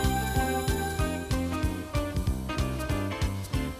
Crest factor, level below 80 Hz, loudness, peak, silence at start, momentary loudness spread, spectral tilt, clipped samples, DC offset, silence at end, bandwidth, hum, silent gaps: 16 dB; -34 dBFS; -30 LUFS; -14 dBFS; 0 s; 4 LU; -5.5 dB/octave; under 0.1%; under 0.1%; 0 s; 15.5 kHz; none; none